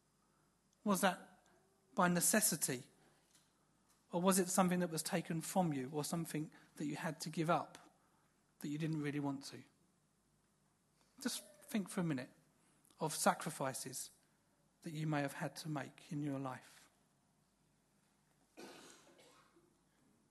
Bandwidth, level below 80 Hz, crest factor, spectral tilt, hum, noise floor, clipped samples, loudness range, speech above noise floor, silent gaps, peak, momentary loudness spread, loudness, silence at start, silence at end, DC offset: 12.5 kHz; -84 dBFS; 24 dB; -4 dB/octave; 50 Hz at -75 dBFS; -77 dBFS; under 0.1%; 9 LU; 38 dB; none; -18 dBFS; 17 LU; -39 LUFS; 0.85 s; 1.35 s; under 0.1%